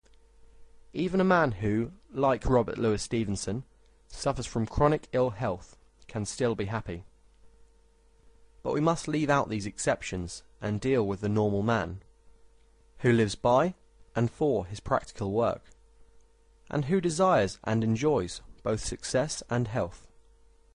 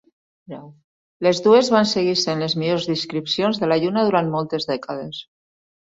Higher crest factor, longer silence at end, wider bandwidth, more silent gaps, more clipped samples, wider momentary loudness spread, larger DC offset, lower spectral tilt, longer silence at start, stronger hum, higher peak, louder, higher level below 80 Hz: about the same, 18 dB vs 18 dB; about the same, 0.8 s vs 0.75 s; first, 11 kHz vs 8 kHz; second, none vs 0.84-1.20 s; neither; second, 12 LU vs 19 LU; neither; about the same, -6 dB/octave vs -5 dB/octave; about the same, 0.6 s vs 0.5 s; neither; second, -10 dBFS vs -2 dBFS; second, -29 LUFS vs -20 LUFS; first, -48 dBFS vs -62 dBFS